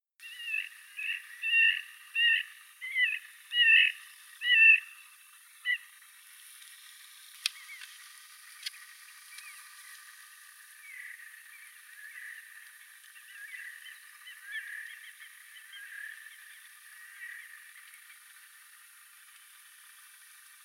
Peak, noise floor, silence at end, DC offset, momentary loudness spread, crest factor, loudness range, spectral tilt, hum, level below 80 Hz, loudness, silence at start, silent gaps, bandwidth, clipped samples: -10 dBFS; -56 dBFS; 3.15 s; under 0.1%; 26 LU; 24 dB; 23 LU; 11 dB/octave; none; under -90 dBFS; -26 LUFS; 0.25 s; none; 16.5 kHz; under 0.1%